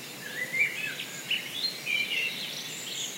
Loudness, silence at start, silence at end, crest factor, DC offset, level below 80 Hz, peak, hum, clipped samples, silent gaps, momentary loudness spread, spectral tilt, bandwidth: -30 LUFS; 0 s; 0 s; 18 dB; under 0.1%; -86 dBFS; -14 dBFS; none; under 0.1%; none; 8 LU; -0.5 dB/octave; 16 kHz